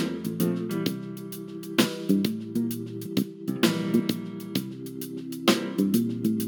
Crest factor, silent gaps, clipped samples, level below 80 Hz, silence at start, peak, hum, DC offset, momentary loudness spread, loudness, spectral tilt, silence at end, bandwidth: 22 dB; none; under 0.1%; -70 dBFS; 0 s; -6 dBFS; none; under 0.1%; 11 LU; -28 LUFS; -5 dB/octave; 0 s; 19 kHz